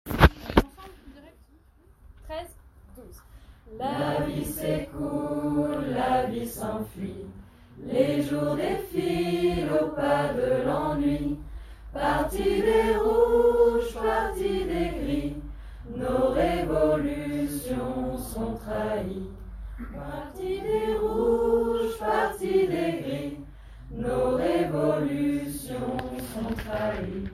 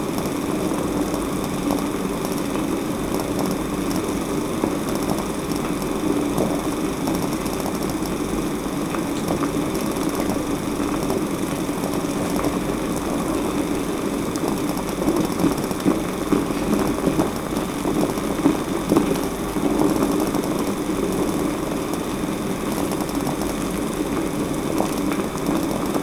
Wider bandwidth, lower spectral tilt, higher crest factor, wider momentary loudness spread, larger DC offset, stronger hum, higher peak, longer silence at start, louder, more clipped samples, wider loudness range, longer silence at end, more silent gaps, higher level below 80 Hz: second, 16 kHz vs over 20 kHz; about the same, -6.5 dB/octave vs -5.5 dB/octave; first, 26 dB vs 20 dB; first, 16 LU vs 4 LU; neither; neither; about the same, 0 dBFS vs -2 dBFS; about the same, 0.05 s vs 0 s; second, -27 LUFS vs -23 LUFS; neither; first, 8 LU vs 2 LU; about the same, 0 s vs 0 s; neither; about the same, -40 dBFS vs -40 dBFS